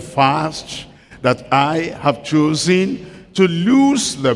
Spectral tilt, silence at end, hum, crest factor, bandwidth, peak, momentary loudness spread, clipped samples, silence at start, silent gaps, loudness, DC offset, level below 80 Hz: -5 dB/octave; 0 s; none; 16 dB; 12 kHz; 0 dBFS; 13 LU; under 0.1%; 0 s; none; -16 LUFS; under 0.1%; -50 dBFS